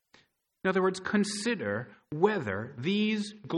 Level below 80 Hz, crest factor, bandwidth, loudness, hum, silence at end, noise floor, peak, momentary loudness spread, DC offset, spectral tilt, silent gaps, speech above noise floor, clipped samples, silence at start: -72 dBFS; 20 dB; 11.5 kHz; -30 LUFS; none; 0 s; -65 dBFS; -10 dBFS; 7 LU; under 0.1%; -5 dB/octave; none; 35 dB; under 0.1%; 0.65 s